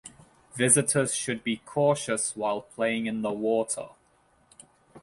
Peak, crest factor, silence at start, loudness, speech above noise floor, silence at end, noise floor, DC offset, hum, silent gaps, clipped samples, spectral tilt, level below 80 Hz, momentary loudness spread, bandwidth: -6 dBFS; 22 dB; 0.05 s; -26 LUFS; 38 dB; 0.05 s; -64 dBFS; under 0.1%; none; none; under 0.1%; -3.5 dB/octave; -66 dBFS; 11 LU; 11.5 kHz